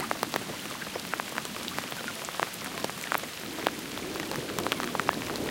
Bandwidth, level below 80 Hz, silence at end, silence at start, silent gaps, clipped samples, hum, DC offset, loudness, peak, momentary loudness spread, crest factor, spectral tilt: 17 kHz; -60 dBFS; 0 s; 0 s; none; under 0.1%; none; under 0.1%; -33 LUFS; -6 dBFS; 5 LU; 28 dB; -2.5 dB/octave